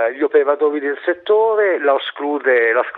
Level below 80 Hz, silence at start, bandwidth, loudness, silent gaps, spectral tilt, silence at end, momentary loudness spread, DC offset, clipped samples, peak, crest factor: -74 dBFS; 0 s; 4.1 kHz; -16 LUFS; none; -6 dB/octave; 0 s; 6 LU; under 0.1%; under 0.1%; -2 dBFS; 14 dB